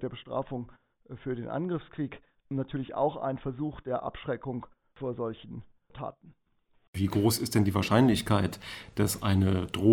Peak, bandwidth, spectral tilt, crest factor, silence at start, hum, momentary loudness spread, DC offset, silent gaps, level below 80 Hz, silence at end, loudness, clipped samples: -10 dBFS; 17 kHz; -6 dB/octave; 20 dB; 0 s; none; 16 LU; under 0.1%; 6.88-6.93 s; -56 dBFS; 0 s; -30 LUFS; under 0.1%